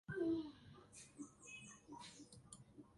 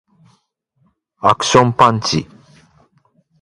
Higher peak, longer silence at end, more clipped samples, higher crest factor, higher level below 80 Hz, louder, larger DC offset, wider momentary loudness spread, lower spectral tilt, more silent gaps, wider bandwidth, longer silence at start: second, -32 dBFS vs 0 dBFS; second, 0 s vs 1.2 s; neither; about the same, 18 dB vs 18 dB; second, -76 dBFS vs -50 dBFS; second, -50 LUFS vs -14 LUFS; neither; first, 18 LU vs 10 LU; about the same, -5 dB/octave vs -4.5 dB/octave; neither; about the same, 11.5 kHz vs 11.5 kHz; second, 0.1 s vs 1.25 s